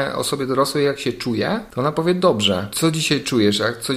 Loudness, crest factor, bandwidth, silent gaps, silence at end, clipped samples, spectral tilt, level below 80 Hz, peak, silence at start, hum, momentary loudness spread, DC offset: -19 LUFS; 16 dB; 16 kHz; none; 0 s; under 0.1%; -4.5 dB/octave; -52 dBFS; -2 dBFS; 0 s; none; 5 LU; under 0.1%